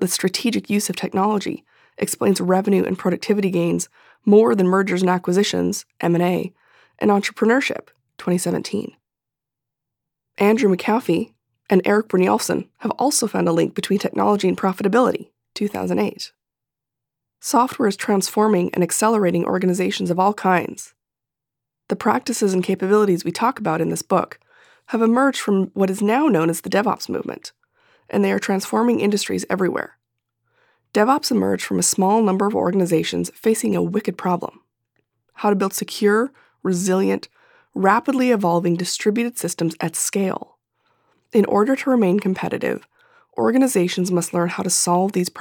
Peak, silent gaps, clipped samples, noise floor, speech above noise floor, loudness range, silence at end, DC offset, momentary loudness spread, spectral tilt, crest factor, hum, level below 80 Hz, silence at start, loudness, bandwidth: -2 dBFS; none; under 0.1%; -86 dBFS; 67 dB; 4 LU; 0 s; under 0.1%; 9 LU; -5 dB/octave; 18 dB; none; -66 dBFS; 0 s; -20 LUFS; 19.5 kHz